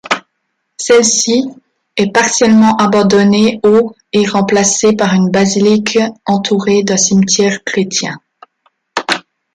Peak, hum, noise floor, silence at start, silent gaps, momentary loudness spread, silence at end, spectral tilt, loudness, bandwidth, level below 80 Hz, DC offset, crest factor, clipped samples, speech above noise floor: 0 dBFS; none; -68 dBFS; 0.1 s; none; 10 LU; 0.35 s; -4 dB/octave; -11 LUFS; 11.5 kHz; -52 dBFS; under 0.1%; 12 dB; under 0.1%; 58 dB